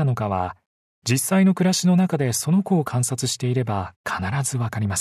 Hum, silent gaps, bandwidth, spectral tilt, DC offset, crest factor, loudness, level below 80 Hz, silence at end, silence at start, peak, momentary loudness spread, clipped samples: none; 0.66-1.02 s, 3.96-4.04 s; 14 kHz; -5 dB/octave; under 0.1%; 14 dB; -22 LUFS; -56 dBFS; 0 s; 0 s; -6 dBFS; 9 LU; under 0.1%